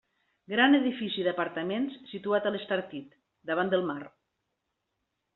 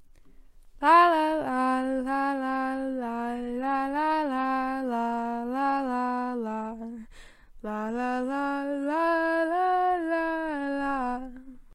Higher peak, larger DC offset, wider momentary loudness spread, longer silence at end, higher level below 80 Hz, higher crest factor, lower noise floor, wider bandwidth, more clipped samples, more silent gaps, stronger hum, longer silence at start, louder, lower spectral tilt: about the same, -8 dBFS vs -8 dBFS; neither; first, 18 LU vs 9 LU; first, 1.25 s vs 0 s; second, -76 dBFS vs -54 dBFS; about the same, 22 dB vs 20 dB; first, -82 dBFS vs -51 dBFS; second, 4.2 kHz vs 13 kHz; neither; neither; neither; first, 0.5 s vs 0 s; about the same, -29 LUFS vs -27 LUFS; second, -2.5 dB/octave vs -5 dB/octave